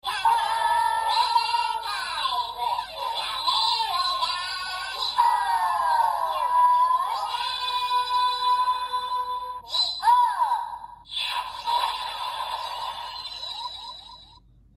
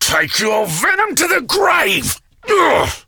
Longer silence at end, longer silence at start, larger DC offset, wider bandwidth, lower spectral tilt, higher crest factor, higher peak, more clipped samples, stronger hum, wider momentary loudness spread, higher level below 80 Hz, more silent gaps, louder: first, 0.5 s vs 0.05 s; about the same, 0.05 s vs 0 s; neither; second, 15.5 kHz vs over 20 kHz; second, 0.5 dB/octave vs -2 dB/octave; about the same, 16 dB vs 14 dB; second, -8 dBFS vs -2 dBFS; neither; neither; first, 11 LU vs 5 LU; second, -60 dBFS vs -42 dBFS; neither; second, -24 LUFS vs -14 LUFS